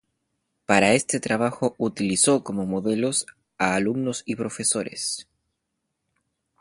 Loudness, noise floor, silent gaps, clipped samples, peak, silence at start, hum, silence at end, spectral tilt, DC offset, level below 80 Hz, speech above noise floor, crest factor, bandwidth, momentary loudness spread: -23 LUFS; -79 dBFS; none; under 0.1%; -2 dBFS; 0.7 s; none; 1.4 s; -3.5 dB/octave; under 0.1%; -60 dBFS; 56 dB; 24 dB; 11.5 kHz; 10 LU